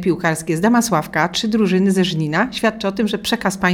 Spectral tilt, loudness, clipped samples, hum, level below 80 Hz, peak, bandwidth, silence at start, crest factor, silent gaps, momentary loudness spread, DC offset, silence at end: -5 dB/octave; -18 LUFS; under 0.1%; none; -48 dBFS; -2 dBFS; 17.5 kHz; 0 s; 16 dB; none; 4 LU; under 0.1%; 0 s